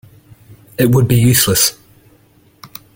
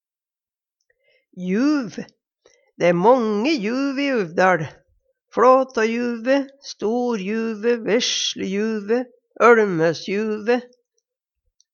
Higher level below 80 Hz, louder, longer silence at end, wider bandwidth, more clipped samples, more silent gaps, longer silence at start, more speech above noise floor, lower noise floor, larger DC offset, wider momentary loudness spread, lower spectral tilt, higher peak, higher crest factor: first, -42 dBFS vs -70 dBFS; first, -12 LUFS vs -20 LUFS; second, 0.3 s vs 1.05 s; first, 17 kHz vs 7.2 kHz; neither; neither; second, 0.8 s vs 1.35 s; second, 39 dB vs over 71 dB; second, -50 dBFS vs under -90 dBFS; neither; first, 23 LU vs 11 LU; about the same, -4.5 dB/octave vs -4.5 dB/octave; about the same, 0 dBFS vs -2 dBFS; about the same, 16 dB vs 20 dB